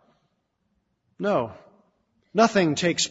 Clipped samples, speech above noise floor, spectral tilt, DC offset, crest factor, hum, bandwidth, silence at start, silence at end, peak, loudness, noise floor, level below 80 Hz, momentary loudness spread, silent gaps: under 0.1%; 51 dB; -4 dB/octave; under 0.1%; 22 dB; none; 8 kHz; 1.2 s; 0 s; -4 dBFS; -23 LUFS; -73 dBFS; -64 dBFS; 11 LU; none